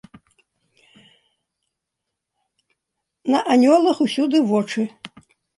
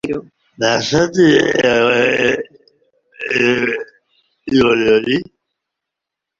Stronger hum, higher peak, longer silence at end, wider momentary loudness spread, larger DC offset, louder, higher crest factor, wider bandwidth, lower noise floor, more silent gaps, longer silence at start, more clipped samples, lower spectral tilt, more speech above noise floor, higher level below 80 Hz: neither; second, -4 dBFS vs 0 dBFS; second, 0.5 s vs 1.15 s; about the same, 15 LU vs 14 LU; neither; second, -18 LUFS vs -14 LUFS; about the same, 18 dB vs 16 dB; first, 11.5 kHz vs 7.8 kHz; about the same, -81 dBFS vs -82 dBFS; neither; first, 3.25 s vs 0.05 s; neither; about the same, -5.5 dB/octave vs -4.5 dB/octave; second, 64 dB vs 68 dB; second, -72 dBFS vs -50 dBFS